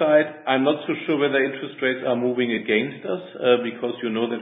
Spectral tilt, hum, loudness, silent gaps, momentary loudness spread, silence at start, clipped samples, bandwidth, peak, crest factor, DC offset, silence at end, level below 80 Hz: -10 dB/octave; none; -23 LUFS; none; 8 LU; 0 s; under 0.1%; 4 kHz; -4 dBFS; 18 dB; under 0.1%; 0 s; -72 dBFS